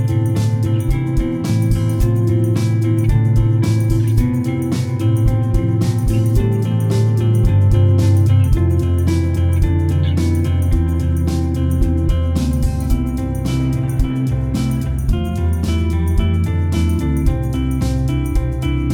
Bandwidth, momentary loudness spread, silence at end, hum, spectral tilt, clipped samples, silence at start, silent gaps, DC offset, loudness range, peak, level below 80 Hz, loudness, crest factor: 15 kHz; 5 LU; 0 s; none; -8 dB/octave; under 0.1%; 0 s; none; under 0.1%; 4 LU; -2 dBFS; -22 dBFS; -17 LUFS; 12 dB